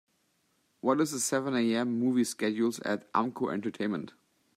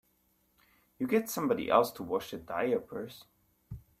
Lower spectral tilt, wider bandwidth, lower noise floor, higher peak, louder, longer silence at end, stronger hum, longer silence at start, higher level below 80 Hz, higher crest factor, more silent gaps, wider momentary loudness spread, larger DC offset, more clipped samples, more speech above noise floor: about the same, -4.5 dB/octave vs -5 dB/octave; about the same, 15.5 kHz vs 16 kHz; about the same, -73 dBFS vs -72 dBFS; about the same, -12 dBFS vs -12 dBFS; about the same, -30 LUFS vs -32 LUFS; first, 0.45 s vs 0.2 s; neither; second, 0.85 s vs 1 s; second, -78 dBFS vs -64 dBFS; about the same, 20 dB vs 22 dB; neither; second, 6 LU vs 23 LU; neither; neither; about the same, 44 dB vs 41 dB